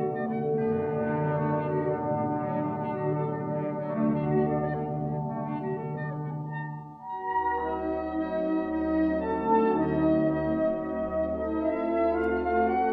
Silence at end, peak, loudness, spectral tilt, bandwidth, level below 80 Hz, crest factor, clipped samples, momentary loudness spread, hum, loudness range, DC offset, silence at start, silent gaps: 0 s; -12 dBFS; -28 LUFS; -11 dB/octave; 4.7 kHz; -50 dBFS; 16 dB; under 0.1%; 8 LU; none; 5 LU; under 0.1%; 0 s; none